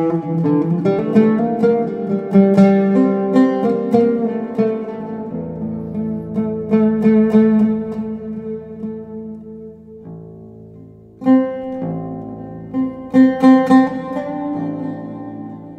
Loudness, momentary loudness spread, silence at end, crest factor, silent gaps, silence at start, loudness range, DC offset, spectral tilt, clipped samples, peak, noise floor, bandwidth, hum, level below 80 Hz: -16 LUFS; 19 LU; 0 s; 16 dB; none; 0 s; 8 LU; under 0.1%; -9.5 dB/octave; under 0.1%; 0 dBFS; -40 dBFS; 8 kHz; none; -54 dBFS